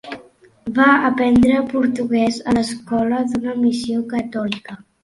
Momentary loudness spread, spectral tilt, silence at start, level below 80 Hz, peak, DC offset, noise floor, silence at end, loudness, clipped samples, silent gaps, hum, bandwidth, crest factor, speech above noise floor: 14 LU; -5.5 dB/octave; 0.05 s; -48 dBFS; -2 dBFS; under 0.1%; -47 dBFS; 0.25 s; -18 LUFS; under 0.1%; none; none; 11.5 kHz; 18 dB; 30 dB